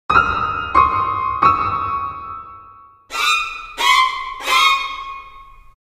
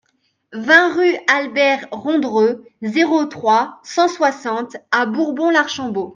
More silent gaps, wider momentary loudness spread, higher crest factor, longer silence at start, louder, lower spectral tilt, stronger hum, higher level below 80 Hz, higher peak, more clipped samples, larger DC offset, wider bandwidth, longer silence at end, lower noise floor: neither; first, 17 LU vs 11 LU; about the same, 18 dB vs 16 dB; second, 0.1 s vs 0.5 s; about the same, -16 LUFS vs -17 LUFS; second, -2 dB/octave vs -4 dB/octave; neither; first, -42 dBFS vs -70 dBFS; about the same, 0 dBFS vs 0 dBFS; neither; neither; first, 15.5 kHz vs 7.6 kHz; first, 0.45 s vs 0 s; second, -44 dBFS vs -66 dBFS